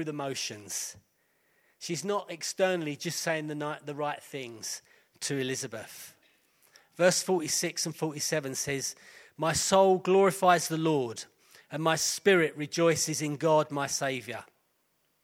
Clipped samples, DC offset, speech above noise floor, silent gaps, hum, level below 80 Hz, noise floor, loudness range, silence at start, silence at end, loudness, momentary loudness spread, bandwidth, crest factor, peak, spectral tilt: under 0.1%; under 0.1%; 45 dB; none; none; -68 dBFS; -74 dBFS; 8 LU; 0 s; 0.8 s; -29 LUFS; 16 LU; 16.5 kHz; 20 dB; -10 dBFS; -3.5 dB/octave